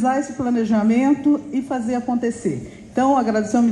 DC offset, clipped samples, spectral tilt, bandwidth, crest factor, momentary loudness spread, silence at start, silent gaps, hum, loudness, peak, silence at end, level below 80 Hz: under 0.1%; under 0.1%; -6.5 dB/octave; 10.5 kHz; 12 dB; 8 LU; 0 s; none; none; -20 LUFS; -6 dBFS; 0 s; -52 dBFS